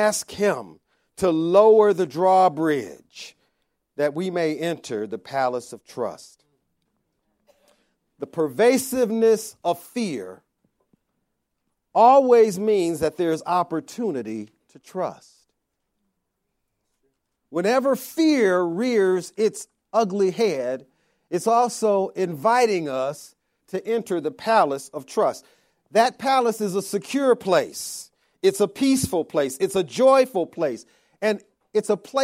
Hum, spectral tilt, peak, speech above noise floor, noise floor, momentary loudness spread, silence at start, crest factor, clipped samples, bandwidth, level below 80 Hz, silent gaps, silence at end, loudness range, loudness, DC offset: none; -4.5 dB/octave; -4 dBFS; 56 dB; -77 dBFS; 14 LU; 0 s; 20 dB; under 0.1%; 16.5 kHz; -64 dBFS; none; 0 s; 9 LU; -22 LUFS; under 0.1%